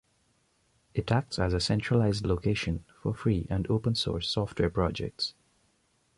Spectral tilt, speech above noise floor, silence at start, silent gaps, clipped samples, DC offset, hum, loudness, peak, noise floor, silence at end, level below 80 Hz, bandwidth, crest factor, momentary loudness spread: -6 dB/octave; 42 dB; 0.95 s; none; under 0.1%; under 0.1%; none; -29 LUFS; -14 dBFS; -70 dBFS; 0.9 s; -44 dBFS; 11.5 kHz; 16 dB; 8 LU